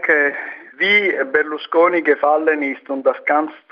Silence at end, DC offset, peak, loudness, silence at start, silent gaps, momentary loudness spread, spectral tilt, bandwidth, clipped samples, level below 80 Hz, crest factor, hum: 0.15 s; under 0.1%; -2 dBFS; -17 LUFS; 0 s; none; 7 LU; -5.5 dB/octave; 6.2 kHz; under 0.1%; -72 dBFS; 14 dB; none